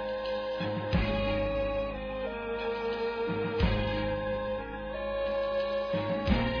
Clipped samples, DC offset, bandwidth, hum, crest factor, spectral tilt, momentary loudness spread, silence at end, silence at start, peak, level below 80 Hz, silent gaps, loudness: under 0.1%; under 0.1%; 5.4 kHz; none; 18 dB; -8 dB/octave; 6 LU; 0 s; 0 s; -14 dBFS; -40 dBFS; none; -32 LUFS